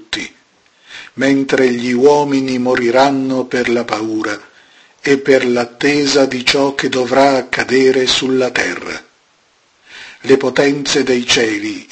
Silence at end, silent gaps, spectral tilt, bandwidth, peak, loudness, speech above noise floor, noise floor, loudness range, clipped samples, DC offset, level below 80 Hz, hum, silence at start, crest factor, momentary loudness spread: 0.1 s; none; -3.5 dB/octave; 8.8 kHz; 0 dBFS; -14 LUFS; 41 dB; -55 dBFS; 3 LU; under 0.1%; under 0.1%; -52 dBFS; none; 0 s; 14 dB; 12 LU